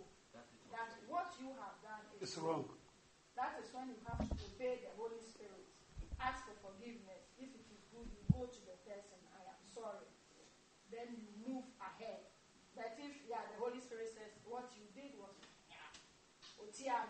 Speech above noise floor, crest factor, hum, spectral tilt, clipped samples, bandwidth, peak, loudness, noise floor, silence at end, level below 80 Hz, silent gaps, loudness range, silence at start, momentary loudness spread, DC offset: 22 dB; 30 dB; none; -5.5 dB/octave; under 0.1%; 8.4 kHz; -20 dBFS; -49 LUFS; -69 dBFS; 0 s; -62 dBFS; none; 6 LU; 0 s; 17 LU; under 0.1%